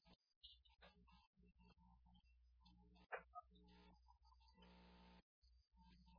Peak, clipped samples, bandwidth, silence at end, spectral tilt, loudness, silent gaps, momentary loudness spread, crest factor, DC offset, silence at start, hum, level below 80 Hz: -40 dBFS; under 0.1%; 5.4 kHz; 0 s; -2.5 dB/octave; -62 LUFS; 0.36-0.41 s, 1.27-1.33 s, 5.23-5.42 s; 13 LU; 28 dB; under 0.1%; 0 s; none; -76 dBFS